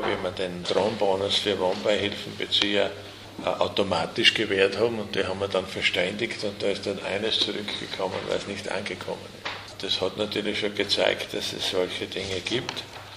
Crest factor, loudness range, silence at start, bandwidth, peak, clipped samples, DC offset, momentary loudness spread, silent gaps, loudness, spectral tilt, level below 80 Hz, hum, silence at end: 24 dB; 4 LU; 0 s; 15.5 kHz; -4 dBFS; under 0.1%; under 0.1%; 10 LU; none; -26 LUFS; -3.5 dB/octave; -58 dBFS; none; 0 s